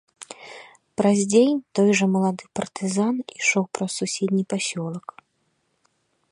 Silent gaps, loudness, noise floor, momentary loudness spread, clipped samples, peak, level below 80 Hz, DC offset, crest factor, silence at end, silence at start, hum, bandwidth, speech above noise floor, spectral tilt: none; -22 LUFS; -71 dBFS; 21 LU; under 0.1%; -6 dBFS; -70 dBFS; under 0.1%; 18 dB; 1.35 s; 0.2 s; none; 11 kHz; 49 dB; -5 dB/octave